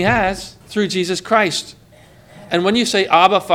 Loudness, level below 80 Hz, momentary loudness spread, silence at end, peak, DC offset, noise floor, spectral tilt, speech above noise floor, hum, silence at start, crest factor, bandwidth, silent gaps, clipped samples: -16 LUFS; -46 dBFS; 12 LU; 0 s; 0 dBFS; under 0.1%; -46 dBFS; -4 dB/octave; 30 dB; none; 0 s; 18 dB; 17 kHz; none; under 0.1%